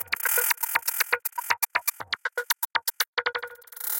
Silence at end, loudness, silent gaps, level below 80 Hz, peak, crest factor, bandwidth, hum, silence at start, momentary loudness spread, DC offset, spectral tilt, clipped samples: 0 s; -26 LUFS; 3.08-3.13 s; -76 dBFS; -6 dBFS; 22 dB; 18 kHz; none; 0 s; 9 LU; under 0.1%; 2 dB/octave; under 0.1%